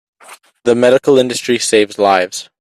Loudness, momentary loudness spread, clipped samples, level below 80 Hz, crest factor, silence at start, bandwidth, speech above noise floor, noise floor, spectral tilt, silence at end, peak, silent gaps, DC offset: -13 LUFS; 6 LU; under 0.1%; -58 dBFS; 14 dB; 0.3 s; 13.5 kHz; 29 dB; -41 dBFS; -3.5 dB/octave; 0.15 s; 0 dBFS; none; under 0.1%